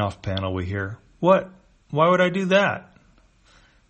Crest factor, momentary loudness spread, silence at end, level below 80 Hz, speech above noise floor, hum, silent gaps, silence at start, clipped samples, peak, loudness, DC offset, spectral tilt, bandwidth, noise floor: 18 dB; 13 LU; 1.1 s; -54 dBFS; 36 dB; none; none; 0 s; under 0.1%; -4 dBFS; -22 LUFS; under 0.1%; -6.5 dB/octave; 8.4 kHz; -57 dBFS